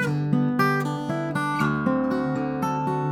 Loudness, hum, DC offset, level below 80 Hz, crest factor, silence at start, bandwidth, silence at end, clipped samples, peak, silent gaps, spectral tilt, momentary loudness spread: -24 LUFS; none; under 0.1%; -56 dBFS; 16 dB; 0 s; 15 kHz; 0 s; under 0.1%; -6 dBFS; none; -7 dB/octave; 5 LU